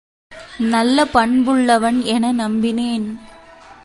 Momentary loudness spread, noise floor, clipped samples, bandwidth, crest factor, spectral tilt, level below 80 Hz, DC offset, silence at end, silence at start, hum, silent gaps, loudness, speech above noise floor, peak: 10 LU; -42 dBFS; under 0.1%; 11.5 kHz; 16 dB; -4.5 dB/octave; -48 dBFS; under 0.1%; 0.1 s; 0.3 s; none; none; -16 LUFS; 26 dB; 0 dBFS